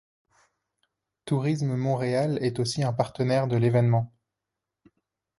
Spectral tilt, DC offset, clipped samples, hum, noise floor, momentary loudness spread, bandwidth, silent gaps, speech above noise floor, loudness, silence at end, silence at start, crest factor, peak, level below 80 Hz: -7 dB/octave; under 0.1%; under 0.1%; none; -86 dBFS; 5 LU; 11.5 kHz; none; 62 dB; -26 LUFS; 1.35 s; 1.25 s; 18 dB; -8 dBFS; -62 dBFS